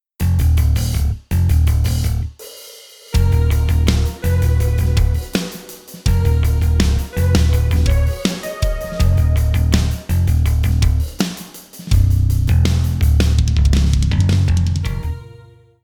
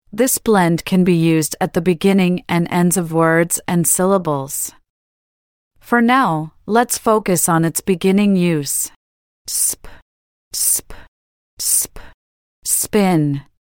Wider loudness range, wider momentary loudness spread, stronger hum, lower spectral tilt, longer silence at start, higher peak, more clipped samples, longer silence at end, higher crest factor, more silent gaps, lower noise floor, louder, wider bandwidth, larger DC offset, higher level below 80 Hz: about the same, 2 LU vs 4 LU; about the same, 8 LU vs 8 LU; neither; first, -6 dB/octave vs -4.5 dB/octave; about the same, 0.2 s vs 0.15 s; about the same, -2 dBFS vs -2 dBFS; neither; first, 0.55 s vs 0.2 s; about the same, 14 dB vs 16 dB; second, none vs 4.90-5.71 s, 8.96-9.45 s, 10.02-10.51 s, 11.08-11.57 s, 12.14-12.62 s; second, -43 dBFS vs under -90 dBFS; about the same, -17 LUFS vs -16 LUFS; about the same, 19.5 kHz vs 18 kHz; neither; first, -18 dBFS vs -48 dBFS